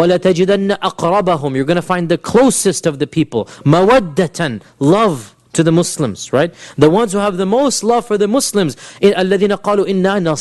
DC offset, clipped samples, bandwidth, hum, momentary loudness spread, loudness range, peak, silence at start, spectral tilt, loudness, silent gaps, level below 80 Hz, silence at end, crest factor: under 0.1%; under 0.1%; 12.5 kHz; none; 6 LU; 1 LU; 0 dBFS; 0 s; -5 dB/octave; -14 LUFS; none; -46 dBFS; 0 s; 14 dB